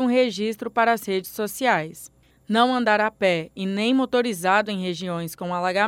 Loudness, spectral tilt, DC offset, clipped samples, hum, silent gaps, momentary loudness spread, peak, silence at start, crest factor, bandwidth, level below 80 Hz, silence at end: -23 LUFS; -4.5 dB/octave; under 0.1%; under 0.1%; none; none; 9 LU; -6 dBFS; 0 s; 18 dB; 17 kHz; -64 dBFS; 0 s